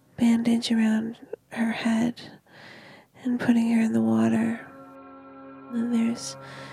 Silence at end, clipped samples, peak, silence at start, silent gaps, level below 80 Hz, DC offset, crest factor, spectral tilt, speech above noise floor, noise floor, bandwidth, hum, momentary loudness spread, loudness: 0 s; under 0.1%; -10 dBFS; 0.2 s; none; -68 dBFS; under 0.1%; 16 dB; -5.5 dB/octave; 25 dB; -49 dBFS; 11.5 kHz; none; 23 LU; -25 LUFS